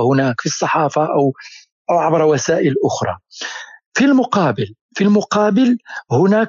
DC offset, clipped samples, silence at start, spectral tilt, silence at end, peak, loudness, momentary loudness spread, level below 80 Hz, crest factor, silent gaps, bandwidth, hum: under 0.1%; under 0.1%; 0 s; -5.5 dB/octave; 0 s; -4 dBFS; -16 LUFS; 13 LU; -64 dBFS; 12 dB; 1.72-1.85 s, 3.86-3.92 s, 4.81-4.89 s; 7.6 kHz; none